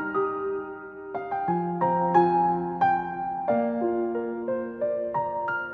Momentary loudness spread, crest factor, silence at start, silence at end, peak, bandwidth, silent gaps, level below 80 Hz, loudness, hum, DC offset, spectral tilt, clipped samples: 10 LU; 18 dB; 0 s; 0 s; -8 dBFS; 5.2 kHz; none; -62 dBFS; -26 LUFS; none; under 0.1%; -9.5 dB/octave; under 0.1%